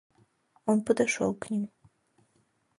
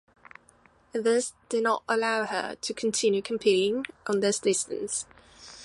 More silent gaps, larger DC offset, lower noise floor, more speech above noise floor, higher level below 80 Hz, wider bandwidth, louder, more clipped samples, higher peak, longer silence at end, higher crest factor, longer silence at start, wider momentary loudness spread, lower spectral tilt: neither; neither; first, -71 dBFS vs -60 dBFS; first, 43 dB vs 33 dB; about the same, -70 dBFS vs -68 dBFS; about the same, 11.5 kHz vs 11.5 kHz; about the same, -29 LUFS vs -27 LUFS; neither; about the same, -12 dBFS vs -10 dBFS; first, 1.15 s vs 0 s; about the same, 20 dB vs 18 dB; second, 0.65 s vs 0.95 s; about the same, 10 LU vs 8 LU; first, -5 dB/octave vs -3 dB/octave